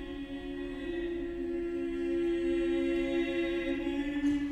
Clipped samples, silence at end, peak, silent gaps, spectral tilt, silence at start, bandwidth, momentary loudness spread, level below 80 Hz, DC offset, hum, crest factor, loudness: under 0.1%; 0 s; -22 dBFS; none; -6 dB/octave; 0 s; 8.6 kHz; 9 LU; -50 dBFS; under 0.1%; none; 12 dB; -33 LUFS